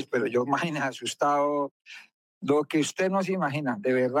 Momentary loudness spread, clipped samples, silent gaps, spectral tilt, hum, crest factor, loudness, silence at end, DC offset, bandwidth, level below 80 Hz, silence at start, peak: 11 LU; under 0.1%; 1.71-1.85 s, 2.14-2.41 s; -5 dB/octave; none; 14 dB; -27 LUFS; 0 s; under 0.1%; 16 kHz; -84 dBFS; 0 s; -12 dBFS